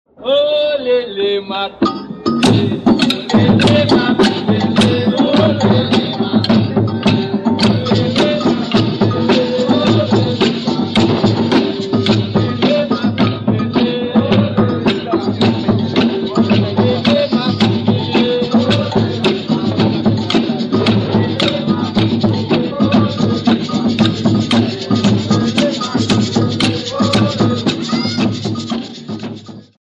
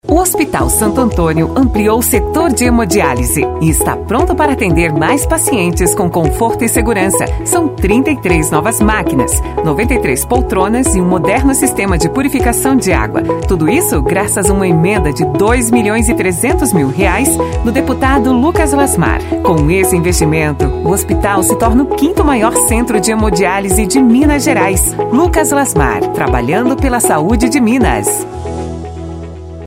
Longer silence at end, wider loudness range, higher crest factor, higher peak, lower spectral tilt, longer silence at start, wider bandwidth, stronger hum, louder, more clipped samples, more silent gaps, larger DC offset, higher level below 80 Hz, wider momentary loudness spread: first, 0.25 s vs 0 s; about the same, 2 LU vs 1 LU; about the same, 12 dB vs 12 dB; about the same, -2 dBFS vs 0 dBFS; first, -6.5 dB/octave vs -5 dB/octave; first, 0.2 s vs 0.05 s; second, 10.5 kHz vs 16.5 kHz; neither; second, -14 LUFS vs -11 LUFS; neither; neither; neither; second, -44 dBFS vs -22 dBFS; about the same, 5 LU vs 3 LU